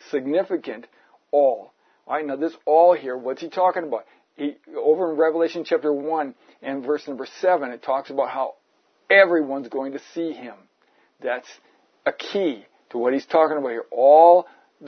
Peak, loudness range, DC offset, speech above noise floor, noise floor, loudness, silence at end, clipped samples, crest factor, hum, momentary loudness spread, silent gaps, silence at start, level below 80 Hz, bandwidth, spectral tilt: -2 dBFS; 5 LU; under 0.1%; 44 dB; -64 dBFS; -21 LUFS; 0 s; under 0.1%; 20 dB; none; 16 LU; none; 0.15 s; -82 dBFS; 6.4 kHz; -5.5 dB/octave